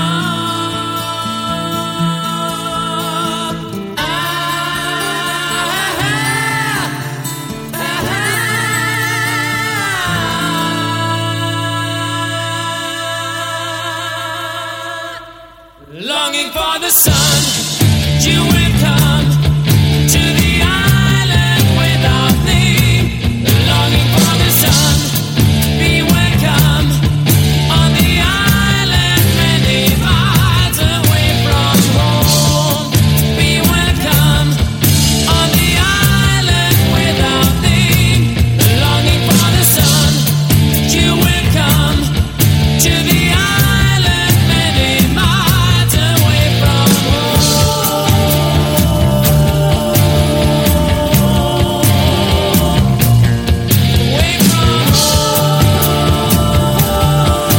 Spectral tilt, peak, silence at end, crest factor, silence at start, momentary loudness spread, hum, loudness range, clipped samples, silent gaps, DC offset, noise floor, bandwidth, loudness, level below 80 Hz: -4.5 dB/octave; 0 dBFS; 0 s; 12 dB; 0 s; 8 LU; none; 7 LU; under 0.1%; none; under 0.1%; -38 dBFS; 17 kHz; -12 LUFS; -24 dBFS